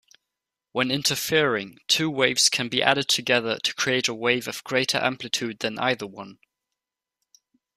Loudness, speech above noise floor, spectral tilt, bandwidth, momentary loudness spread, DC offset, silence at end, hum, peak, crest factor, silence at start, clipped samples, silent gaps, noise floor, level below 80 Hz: -23 LUFS; 61 dB; -2.5 dB/octave; 15.5 kHz; 9 LU; under 0.1%; 1.45 s; none; -2 dBFS; 24 dB; 0.75 s; under 0.1%; none; -86 dBFS; -66 dBFS